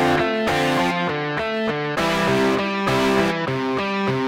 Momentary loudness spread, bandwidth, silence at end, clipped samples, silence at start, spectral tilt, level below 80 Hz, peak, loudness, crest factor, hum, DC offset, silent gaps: 4 LU; 16 kHz; 0 s; under 0.1%; 0 s; -5 dB/octave; -48 dBFS; -8 dBFS; -20 LUFS; 12 dB; none; under 0.1%; none